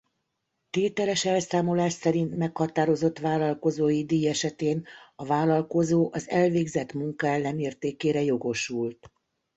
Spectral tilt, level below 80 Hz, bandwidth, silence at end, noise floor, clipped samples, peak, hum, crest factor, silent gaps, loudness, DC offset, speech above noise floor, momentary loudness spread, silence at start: -5.5 dB/octave; -64 dBFS; 8.2 kHz; 0.65 s; -79 dBFS; under 0.1%; -10 dBFS; none; 16 dB; none; -26 LUFS; under 0.1%; 53 dB; 6 LU; 0.75 s